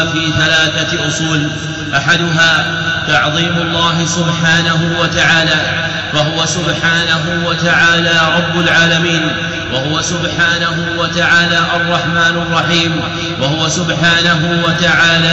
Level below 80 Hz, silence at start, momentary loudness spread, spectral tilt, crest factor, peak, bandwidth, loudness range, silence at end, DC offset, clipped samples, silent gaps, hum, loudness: -38 dBFS; 0 s; 6 LU; -3.5 dB/octave; 12 dB; -2 dBFS; 8.2 kHz; 1 LU; 0 s; 0.2%; under 0.1%; none; none; -11 LUFS